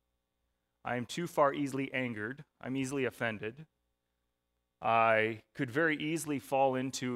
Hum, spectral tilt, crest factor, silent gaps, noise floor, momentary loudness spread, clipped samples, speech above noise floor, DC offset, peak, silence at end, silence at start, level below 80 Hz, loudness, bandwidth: 60 Hz at -65 dBFS; -5 dB/octave; 20 dB; none; -84 dBFS; 12 LU; under 0.1%; 51 dB; under 0.1%; -14 dBFS; 0 s; 0.85 s; -74 dBFS; -33 LUFS; 16 kHz